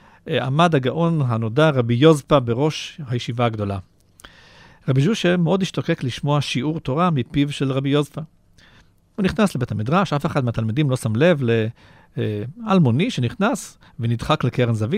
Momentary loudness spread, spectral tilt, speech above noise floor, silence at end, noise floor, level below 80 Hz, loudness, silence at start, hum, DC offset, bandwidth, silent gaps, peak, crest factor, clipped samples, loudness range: 10 LU; -6.5 dB/octave; 34 dB; 0 s; -53 dBFS; -48 dBFS; -20 LUFS; 0.25 s; none; under 0.1%; 14.5 kHz; none; -2 dBFS; 18 dB; under 0.1%; 4 LU